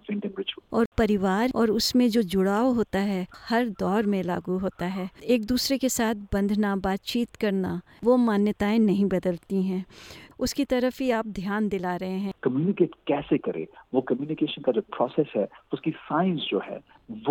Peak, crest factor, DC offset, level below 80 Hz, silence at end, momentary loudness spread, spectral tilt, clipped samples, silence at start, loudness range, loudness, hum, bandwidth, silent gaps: -10 dBFS; 16 dB; under 0.1%; -50 dBFS; 0 s; 9 LU; -5.5 dB/octave; under 0.1%; 0.1 s; 4 LU; -26 LUFS; none; 18 kHz; 0.86-0.92 s